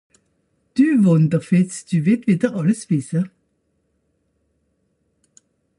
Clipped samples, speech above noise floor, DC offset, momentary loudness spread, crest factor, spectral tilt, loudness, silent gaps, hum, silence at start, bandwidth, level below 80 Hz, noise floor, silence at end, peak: under 0.1%; 51 dB; under 0.1%; 10 LU; 18 dB; -7.5 dB/octave; -19 LUFS; none; none; 0.75 s; 11.5 kHz; -64 dBFS; -68 dBFS; 2.5 s; -4 dBFS